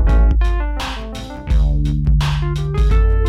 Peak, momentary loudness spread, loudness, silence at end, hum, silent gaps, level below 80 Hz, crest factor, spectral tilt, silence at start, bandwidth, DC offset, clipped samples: -4 dBFS; 10 LU; -18 LUFS; 0 s; none; none; -16 dBFS; 10 dB; -7 dB/octave; 0 s; 7.6 kHz; under 0.1%; under 0.1%